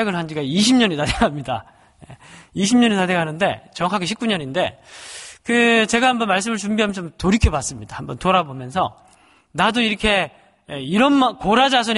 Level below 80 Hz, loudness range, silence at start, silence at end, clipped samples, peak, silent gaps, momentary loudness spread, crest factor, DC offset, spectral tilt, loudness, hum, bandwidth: -36 dBFS; 2 LU; 0 s; 0 s; under 0.1%; -2 dBFS; none; 15 LU; 18 dB; under 0.1%; -4.5 dB/octave; -19 LUFS; none; 11.5 kHz